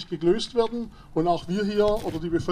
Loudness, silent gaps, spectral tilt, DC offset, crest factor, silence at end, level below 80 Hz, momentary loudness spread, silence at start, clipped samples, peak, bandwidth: -25 LUFS; none; -6.5 dB/octave; under 0.1%; 16 dB; 0 s; -44 dBFS; 5 LU; 0 s; under 0.1%; -10 dBFS; 14.5 kHz